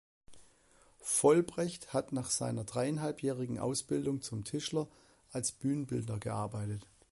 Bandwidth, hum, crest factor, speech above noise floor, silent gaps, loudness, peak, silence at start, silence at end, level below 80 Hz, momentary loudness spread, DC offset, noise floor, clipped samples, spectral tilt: 12 kHz; none; 22 dB; 31 dB; none; -35 LUFS; -14 dBFS; 0.3 s; 0.3 s; -64 dBFS; 10 LU; under 0.1%; -65 dBFS; under 0.1%; -5 dB/octave